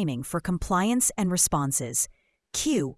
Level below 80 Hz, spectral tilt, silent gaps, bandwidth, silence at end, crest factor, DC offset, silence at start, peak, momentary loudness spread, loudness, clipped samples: -46 dBFS; -4 dB/octave; none; 12 kHz; 0.05 s; 18 dB; under 0.1%; 0 s; -8 dBFS; 8 LU; -25 LUFS; under 0.1%